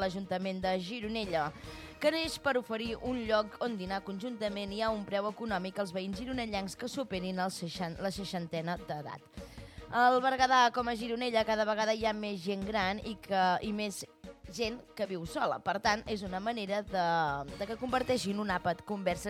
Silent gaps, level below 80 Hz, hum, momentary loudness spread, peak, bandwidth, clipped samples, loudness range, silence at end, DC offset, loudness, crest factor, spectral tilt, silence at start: none; -56 dBFS; none; 10 LU; -14 dBFS; 16 kHz; under 0.1%; 7 LU; 0 s; under 0.1%; -33 LUFS; 20 dB; -4.5 dB/octave; 0 s